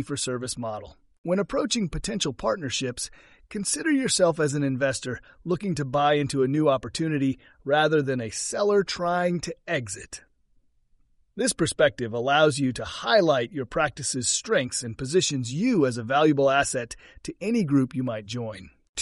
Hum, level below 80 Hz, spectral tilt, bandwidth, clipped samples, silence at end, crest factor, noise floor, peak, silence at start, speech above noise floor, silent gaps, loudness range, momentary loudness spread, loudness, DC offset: none; -52 dBFS; -4 dB/octave; 11.5 kHz; under 0.1%; 0 s; 20 dB; -64 dBFS; -6 dBFS; 0 s; 39 dB; 1.18-1.24 s, 18.89-18.94 s; 4 LU; 13 LU; -25 LUFS; under 0.1%